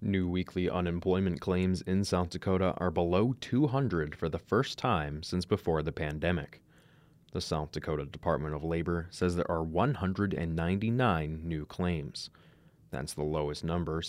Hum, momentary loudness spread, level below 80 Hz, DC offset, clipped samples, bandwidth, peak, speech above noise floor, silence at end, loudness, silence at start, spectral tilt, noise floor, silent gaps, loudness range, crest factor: none; 7 LU; -52 dBFS; under 0.1%; under 0.1%; 14.5 kHz; -14 dBFS; 30 dB; 0 s; -32 LUFS; 0 s; -6.5 dB/octave; -61 dBFS; none; 4 LU; 18 dB